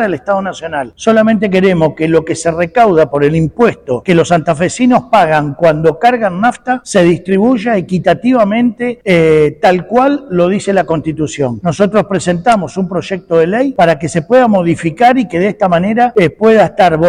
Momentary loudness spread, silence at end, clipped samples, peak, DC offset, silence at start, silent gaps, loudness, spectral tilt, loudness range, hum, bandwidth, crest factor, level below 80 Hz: 7 LU; 0 s; under 0.1%; 0 dBFS; under 0.1%; 0 s; none; -11 LUFS; -6.5 dB/octave; 2 LU; none; 12 kHz; 10 dB; -42 dBFS